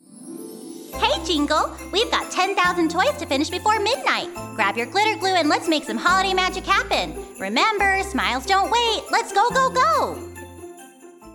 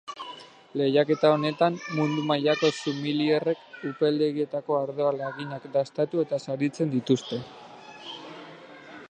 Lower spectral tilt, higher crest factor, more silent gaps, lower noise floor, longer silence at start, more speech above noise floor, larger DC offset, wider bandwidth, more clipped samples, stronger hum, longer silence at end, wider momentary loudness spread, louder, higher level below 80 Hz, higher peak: second, -3 dB/octave vs -6 dB/octave; about the same, 18 dB vs 20 dB; neither; about the same, -44 dBFS vs -46 dBFS; about the same, 0.1 s vs 0.05 s; about the same, 23 dB vs 20 dB; neither; first, 18 kHz vs 9.6 kHz; neither; neither; about the same, 0 s vs 0.05 s; second, 17 LU vs 20 LU; first, -20 LUFS vs -26 LUFS; first, -44 dBFS vs -76 dBFS; about the same, -4 dBFS vs -6 dBFS